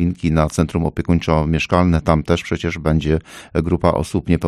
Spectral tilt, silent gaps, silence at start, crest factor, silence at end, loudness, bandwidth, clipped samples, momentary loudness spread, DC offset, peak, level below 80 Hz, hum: -7 dB/octave; none; 0 s; 16 dB; 0 s; -18 LUFS; 12.5 kHz; under 0.1%; 5 LU; under 0.1%; -2 dBFS; -30 dBFS; none